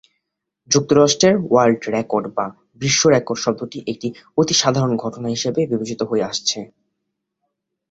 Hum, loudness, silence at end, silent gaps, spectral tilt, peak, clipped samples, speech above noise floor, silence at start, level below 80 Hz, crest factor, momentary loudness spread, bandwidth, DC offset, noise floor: none; -18 LUFS; 1.25 s; none; -4 dB/octave; 0 dBFS; under 0.1%; 59 dB; 0.7 s; -56 dBFS; 20 dB; 12 LU; 8 kHz; under 0.1%; -77 dBFS